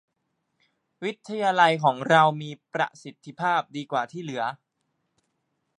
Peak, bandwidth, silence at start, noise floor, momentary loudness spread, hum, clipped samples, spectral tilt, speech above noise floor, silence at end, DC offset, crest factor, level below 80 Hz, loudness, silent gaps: -6 dBFS; 10.5 kHz; 1 s; -77 dBFS; 14 LU; none; under 0.1%; -5 dB/octave; 52 dB; 1.25 s; under 0.1%; 22 dB; -80 dBFS; -24 LUFS; none